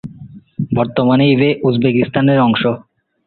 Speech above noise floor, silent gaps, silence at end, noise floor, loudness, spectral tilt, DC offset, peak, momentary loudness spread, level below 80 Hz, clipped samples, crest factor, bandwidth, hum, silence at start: 24 dB; none; 0.5 s; -37 dBFS; -14 LUFS; -10.5 dB/octave; under 0.1%; -2 dBFS; 14 LU; -50 dBFS; under 0.1%; 14 dB; 4.4 kHz; none; 0.05 s